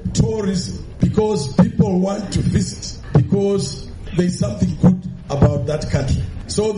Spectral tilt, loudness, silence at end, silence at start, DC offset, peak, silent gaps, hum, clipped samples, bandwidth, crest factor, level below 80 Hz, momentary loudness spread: -7 dB/octave; -19 LUFS; 0 s; 0 s; under 0.1%; -6 dBFS; none; none; under 0.1%; 11 kHz; 12 dB; -32 dBFS; 9 LU